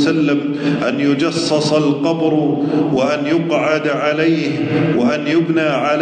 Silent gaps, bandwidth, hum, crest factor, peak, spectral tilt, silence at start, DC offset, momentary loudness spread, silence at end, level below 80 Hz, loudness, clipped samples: none; 9.4 kHz; none; 12 dB; -4 dBFS; -6 dB/octave; 0 s; under 0.1%; 2 LU; 0 s; -60 dBFS; -16 LUFS; under 0.1%